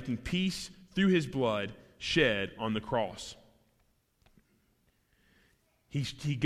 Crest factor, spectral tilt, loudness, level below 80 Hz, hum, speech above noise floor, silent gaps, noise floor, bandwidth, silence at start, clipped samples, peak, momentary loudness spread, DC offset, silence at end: 20 dB; -5.5 dB/octave; -32 LUFS; -58 dBFS; none; 41 dB; none; -72 dBFS; 14.5 kHz; 0 s; under 0.1%; -14 dBFS; 13 LU; under 0.1%; 0 s